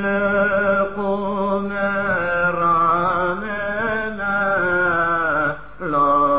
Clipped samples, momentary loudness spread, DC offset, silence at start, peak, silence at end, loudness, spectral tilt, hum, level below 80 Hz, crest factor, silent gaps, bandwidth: under 0.1%; 6 LU; 1%; 0 s; -8 dBFS; 0 s; -19 LUFS; -9.5 dB/octave; none; -46 dBFS; 12 dB; none; 4 kHz